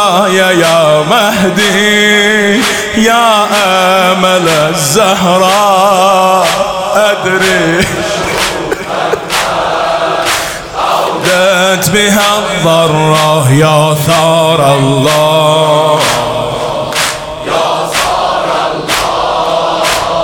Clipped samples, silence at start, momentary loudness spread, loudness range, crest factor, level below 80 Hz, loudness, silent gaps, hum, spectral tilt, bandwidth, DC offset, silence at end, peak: under 0.1%; 0 s; 6 LU; 4 LU; 8 dB; -38 dBFS; -9 LUFS; none; none; -3.5 dB/octave; over 20 kHz; under 0.1%; 0 s; 0 dBFS